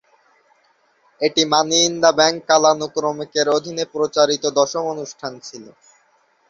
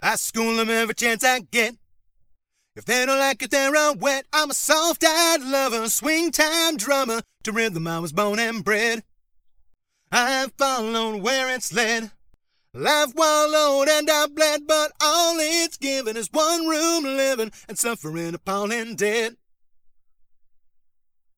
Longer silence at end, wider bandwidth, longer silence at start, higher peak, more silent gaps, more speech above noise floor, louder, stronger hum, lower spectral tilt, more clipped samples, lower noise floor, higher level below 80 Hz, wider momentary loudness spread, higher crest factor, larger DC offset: second, 0.8 s vs 2.05 s; second, 7.6 kHz vs over 20 kHz; first, 1.2 s vs 0 s; about the same, -2 dBFS vs -4 dBFS; neither; about the same, 42 dB vs 40 dB; first, -17 LUFS vs -21 LUFS; neither; about the same, -2 dB/octave vs -2 dB/octave; neither; about the same, -60 dBFS vs -62 dBFS; about the same, -64 dBFS vs -62 dBFS; first, 15 LU vs 8 LU; about the same, 18 dB vs 20 dB; neither